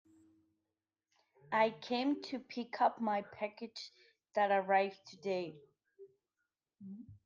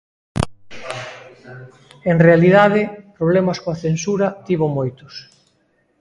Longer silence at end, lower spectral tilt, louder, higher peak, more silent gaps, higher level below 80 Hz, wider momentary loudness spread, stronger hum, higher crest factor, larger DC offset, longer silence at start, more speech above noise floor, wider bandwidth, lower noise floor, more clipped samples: second, 0.1 s vs 0.8 s; second, -5.5 dB/octave vs -7 dB/octave; second, -36 LUFS vs -17 LUFS; second, -18 dBFS vs 0 dBFS; neither; second, -86 dBFS vs -46 dBFS; second, 18 LU vs 25 LU; neither; about the same, 20 dB vs 18 dB; neither; first, 1.5 s vs 0.35 s; first, over 54 dB vs 46 dB; second, 7.4 kHz vs 11.5 kHz; first, under -90 dBFS vs -62 dBFS; neither